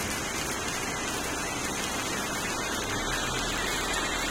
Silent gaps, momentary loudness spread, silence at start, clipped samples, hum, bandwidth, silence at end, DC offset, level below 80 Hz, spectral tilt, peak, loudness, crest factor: none; 2 LU; 0 s; under 0.1%; none; 17 kHz; 0 s; under 0.1%; -44 dBFS; -2 dB/octave; -14 dBFS; -29 LUFS; 16 dB